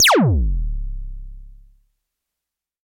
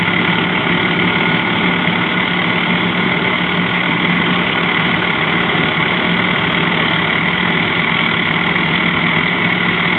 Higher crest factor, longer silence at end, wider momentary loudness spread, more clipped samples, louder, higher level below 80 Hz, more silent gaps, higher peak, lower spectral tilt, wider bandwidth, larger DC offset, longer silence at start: about the same, 14 dB vs 14 dB; first, 1.35 s vs 0 s; first, 23 LU vs 1 LU; neither; second, -19 LUFS vs -13 LUFS; first, -26 dBFS vs -44 dBFS; neither; second, -6 dBFS vs 0 dBFS; second, -3.5 dB/octave vs -7.5 dB/octave; first, 16.5 kHz vs 4.8 kHz; neither; about the same, 0 s vs 0 s